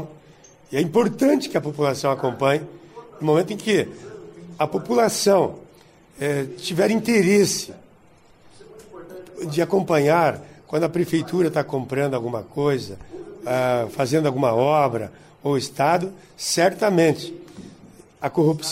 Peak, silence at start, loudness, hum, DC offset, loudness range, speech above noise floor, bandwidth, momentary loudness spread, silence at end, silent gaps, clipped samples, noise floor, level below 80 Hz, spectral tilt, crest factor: -6 dBFS; 0 s; -21 LUFS; none; under 0.1%; 3 LU; 32 dB; 16 kHz; 19 LU; 0 s; none; under 0.1%; -52 dBFS; -60 dBFS; -5 dB/octave; 16 dB